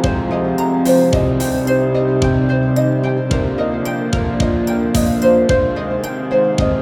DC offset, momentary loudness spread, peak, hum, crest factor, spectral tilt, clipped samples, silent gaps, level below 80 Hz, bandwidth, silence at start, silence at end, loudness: under 0.1%; 6 LU; -2 dBFS; none; 14 dB; -6.5 dB/octave; under 0.1%; none; -28 dBFS; 17.5 kHz; 0 s; 0 s; -16 LUFS